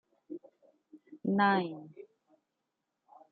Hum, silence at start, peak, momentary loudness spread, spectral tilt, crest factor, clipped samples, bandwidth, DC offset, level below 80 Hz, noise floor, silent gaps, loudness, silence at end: none; 0.3 s; -14 dBFS; 21 LU; -4.5 dB/octave; 22 dB; under 0.1%; 4.7 kHz; under 0.1%; -88 dBFS; -85 dBFS; none; -30 LUFS; 1.3 s